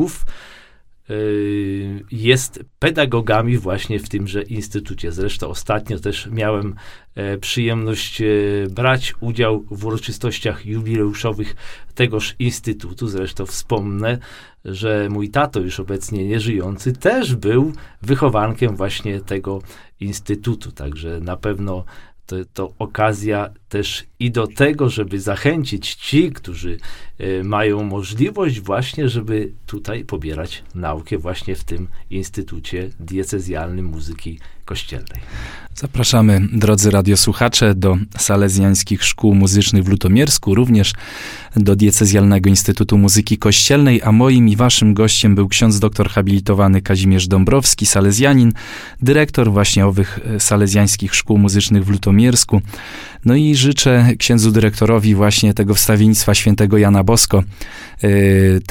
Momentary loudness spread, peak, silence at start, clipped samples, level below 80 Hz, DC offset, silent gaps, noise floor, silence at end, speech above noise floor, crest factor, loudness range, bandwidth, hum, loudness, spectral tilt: 16 LU; 0 dBFS; 0 s; under 0.1%; -34 dBFS; under 0.1%; none; -45 dBFS; 0 s; 30 dB; 16 dB; 12 LU; 17 kHz; none; -15 LUFS; -5 dB/octave